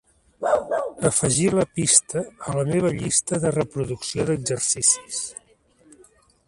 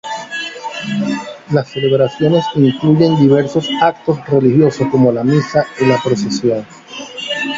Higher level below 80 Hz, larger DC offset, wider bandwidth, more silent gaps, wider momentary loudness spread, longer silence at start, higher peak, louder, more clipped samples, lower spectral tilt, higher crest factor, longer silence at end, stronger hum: about the same, -52 dBFS vs -52 dBFS; neither; first, 11.5 kHz vs 7.8 kHz; neither; about the same, 12 LU vs 12 LU; first, 0.4 s vs 0.05 s; about the same, 0 dBFS vs 0 dBFS; second, -22 LUFS vs -14 LUFS; neither; second, -4 dB/octave vs -6.5 dB/octave; first, 22 dB vs 14 dB; first, 1.15 s vs 0 s; neither